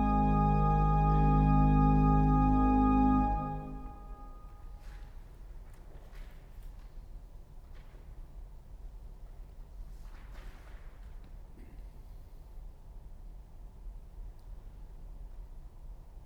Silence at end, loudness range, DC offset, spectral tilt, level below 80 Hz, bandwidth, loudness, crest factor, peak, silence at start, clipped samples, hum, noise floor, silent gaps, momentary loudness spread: 0 s; 26 LU; under 0.1%; -10 dB/octave; -36 dBFS; 5.2 kHz; -28 LUFS; 16 dB; -16 dBFS; 0 s; under 0.1%; none; -49 dBFS; none; 27 LU